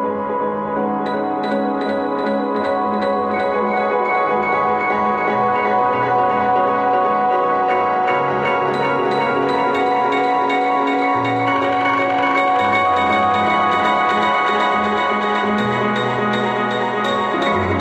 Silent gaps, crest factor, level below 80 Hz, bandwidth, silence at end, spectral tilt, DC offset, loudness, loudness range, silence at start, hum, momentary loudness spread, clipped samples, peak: none; 14 dB; -56 dBFS; 9.4 kHz; 0 s; -6 dB/octave; under 0.1%; -17 LUFS; 3 LU; 0 s; none; 4 LU; under 0.1%; -4 dBFS